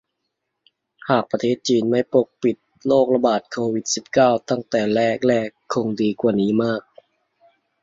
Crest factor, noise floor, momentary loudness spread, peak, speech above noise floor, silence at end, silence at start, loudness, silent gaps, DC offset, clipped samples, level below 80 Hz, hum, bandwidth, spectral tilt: 18 dB; -77 dBFS; 7 LU; -2 dBFS; 58 dB; 1.05 s; 1.05 s; -20 LUFS; none; under 0.1%; under 0.1%; -62 dBFS; none; 8 kHz; -5 dB/octave